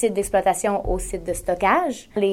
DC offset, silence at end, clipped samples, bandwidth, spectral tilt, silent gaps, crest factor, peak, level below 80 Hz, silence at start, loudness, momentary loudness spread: under 0.1%; 0 s; under 0.1%; 16 kHz; -4.5 dB/octave; none; 16 dB; -4 dBFS; -36 dBFS; 0 s; -22 LUFS; 7 LU